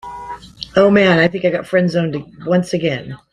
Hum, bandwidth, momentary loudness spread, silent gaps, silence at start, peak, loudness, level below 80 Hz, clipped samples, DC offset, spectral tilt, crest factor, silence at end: none; 11 kHz; 19 LU; none; 0.05 s; 0 dBFS; -16 LUFS; -50 dBFS; under 0.1%; under 0.1%; -6.5 dB/octave; 16 dB; 0.15 s